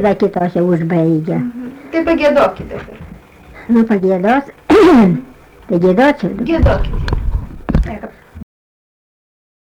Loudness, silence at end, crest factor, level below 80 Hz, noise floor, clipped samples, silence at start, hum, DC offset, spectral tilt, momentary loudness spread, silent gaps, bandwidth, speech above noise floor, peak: -14 LUFS; 1.2 s; 12 dB; -24 dBFS; -38 dBFS; under 0.1%; 0 s; none; under 0.1%; -8 dB/octave; 16 LU; none; 13 kHz; 25 dB; -2 dBFS